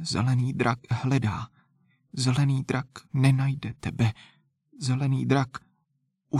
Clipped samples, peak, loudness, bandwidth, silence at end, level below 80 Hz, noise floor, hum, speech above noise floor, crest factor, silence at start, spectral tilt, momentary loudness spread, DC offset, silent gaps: under 0.1%; -8 dBFS; -27 LUFS; 11.5 kHz; 0 s; -56 dBFS; -75 dBFS; none; 49 dB; 18 dB; 0 s; -6.5 dB/octave; 11 LU; under 0.1%; none